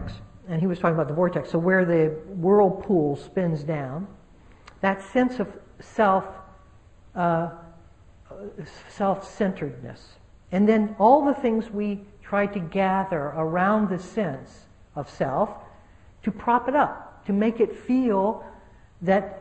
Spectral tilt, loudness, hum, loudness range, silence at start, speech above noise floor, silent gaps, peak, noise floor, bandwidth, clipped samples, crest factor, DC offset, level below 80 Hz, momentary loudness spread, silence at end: -8.5 dB/octave; -24 LUFS; none; 6 LU; 0 s; 28 dB; none; -4 dBFS; -52 dBFS; 8.6 kHz; under 0.1%; 20 dB; under 0.1%; -54 dBFS; 17 LU; 0 s